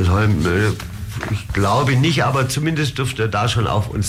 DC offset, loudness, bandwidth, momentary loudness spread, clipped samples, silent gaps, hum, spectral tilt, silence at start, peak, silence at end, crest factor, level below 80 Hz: under 0.1%; -18 LUFS; 15.5 kHz; 9 LU; under 0.1%; none; none; -5.5 dB/octave; 0 s; -8 dBFS; 0 s; 10 dB; -34 dBFS